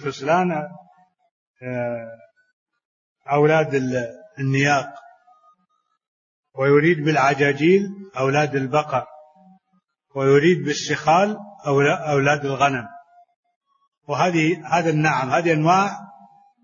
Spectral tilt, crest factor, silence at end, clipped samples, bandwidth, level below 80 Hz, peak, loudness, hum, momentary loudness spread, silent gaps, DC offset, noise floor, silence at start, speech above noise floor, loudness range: -6 dB/octave; 16 dB; 0.6 s; under 0.1%; 7.4 kHz; -62 dBFS; -4 dBFS; -20 LUFS; none; 14 LU; 1.31-1.54 s, 2.53-2.66 s, 2.85-3.16 s, 6.08-6.43 s, 13.36-13.43 s, 13.56-13.61 s, 13.88-13.92 s; under 0.1%; -69 dBFS; 0 s; 50 dB; 5 LU